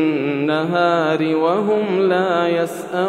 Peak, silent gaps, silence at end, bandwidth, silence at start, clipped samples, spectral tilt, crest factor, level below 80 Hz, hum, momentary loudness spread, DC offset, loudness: -4 dBFS; none; 0 s; 14.5 kHz; 0 s; under 0.1%; -6.5 dB/octave; 14 dB; -70 dBFS; none; 3 LU; under 0.1%; -18 LUFS